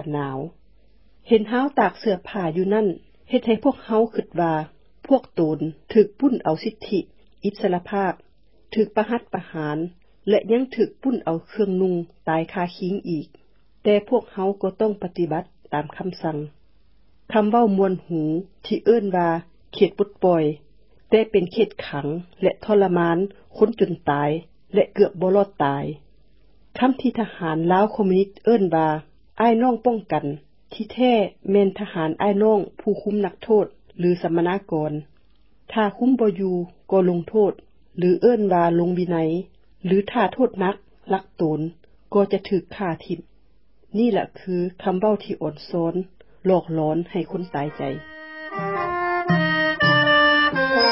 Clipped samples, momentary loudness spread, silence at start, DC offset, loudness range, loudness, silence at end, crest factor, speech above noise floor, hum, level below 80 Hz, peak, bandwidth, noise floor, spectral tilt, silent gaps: under 0.1%; 11 LU; 0 s; 0.2%; 4 LU; -22 LUFS; 0 s; 18 dB; 39 dB; none; -58 dBFS; -4 dBFS; 5.8 kHz; -60 dBFS; -10.5 dB/octave; none